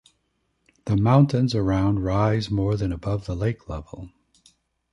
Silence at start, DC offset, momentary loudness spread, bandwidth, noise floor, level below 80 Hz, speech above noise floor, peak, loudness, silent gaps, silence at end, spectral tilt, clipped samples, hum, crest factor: 0.85 s; under 0.1%; 17 LU; 10.5 kHz; -72 dBFS; -40 dBFS; 50 dB; -4 dBFS; -23 LUFS; none; 0.85 s; -8 dB/octave; under 0.1%; none; 20 dB